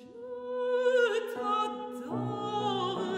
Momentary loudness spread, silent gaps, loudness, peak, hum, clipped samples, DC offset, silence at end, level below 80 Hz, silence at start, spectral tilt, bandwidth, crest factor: 12 LU; none; -31 LUFS; -16 dBFS; none; under 0.1%; under 0.1%; 0 s; -76 dBFS; 0 s; -5.5 dB/octave; 15 kHz; 16 dB